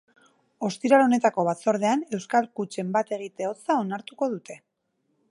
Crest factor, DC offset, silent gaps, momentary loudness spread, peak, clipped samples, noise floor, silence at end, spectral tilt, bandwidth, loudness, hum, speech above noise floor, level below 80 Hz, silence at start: 20 dB; under 0.1%; none; 12 LU; -6 dBFS; under 0.1%; -74 dBFS; 0.75 s; -5.5 dB/octave; 11.5 kHz; -25 LUFS; none; 50 dB; -80 dBFS; 0.6 s